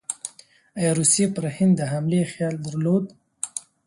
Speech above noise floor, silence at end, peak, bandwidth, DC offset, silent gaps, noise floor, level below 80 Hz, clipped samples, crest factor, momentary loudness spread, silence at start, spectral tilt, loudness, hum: 29 dB; 0.25 s; -6 dBFS; 11.5 kHz; under 0.1%; none; -51 dBFS; -64 dBFS; under 0.1%; 18 dB; 15 LU; 0.1 s; -5 dB/octave; -23 LUFS; none